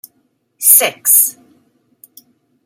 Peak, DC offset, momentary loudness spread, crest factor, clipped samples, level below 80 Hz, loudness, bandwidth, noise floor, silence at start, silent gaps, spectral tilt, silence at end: 0 dBFS; under 0.1%; 7 LU; 16 dB; 0.3%; -74 dBFS; -9 LUFS; over 20 kHz; -62 dBFS; 0.6 s; none; 1.5 dB/octave; 1.35 s